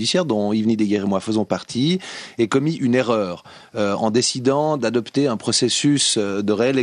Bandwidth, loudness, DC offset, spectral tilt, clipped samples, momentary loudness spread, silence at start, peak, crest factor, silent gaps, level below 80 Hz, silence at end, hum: 11 kHz; -20 LUFS; under 0.1%; -4.5 dB/octave; under 0.1%; 7 LU; 0 s; -4 dBFS; 16 dB; none; -62 dBFS; 0 s; none